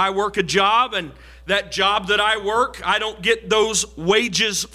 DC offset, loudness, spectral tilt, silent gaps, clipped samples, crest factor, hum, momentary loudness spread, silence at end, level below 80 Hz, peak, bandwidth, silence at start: under 0.1%; -19 LUFS; -2 dB/octave; none; under 0.1%; 14 dB; none; 5 LU; 0.1 s; -46 dBFS; -6 dBFS; 16 kHz; 0 s